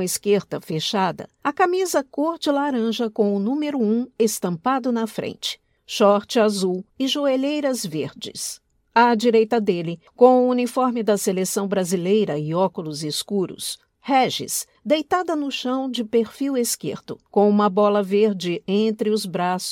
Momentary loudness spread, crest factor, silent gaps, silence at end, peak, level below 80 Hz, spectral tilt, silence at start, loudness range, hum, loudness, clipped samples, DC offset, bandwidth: 10 LU; 20 dB; none; 0 s; -2 dBFS; -68 dBFS; -4.5 dB/octave; 0 s; 4 LU; none; -21 LUFS; under 0.1%; under 0.1%; 17.5 kHz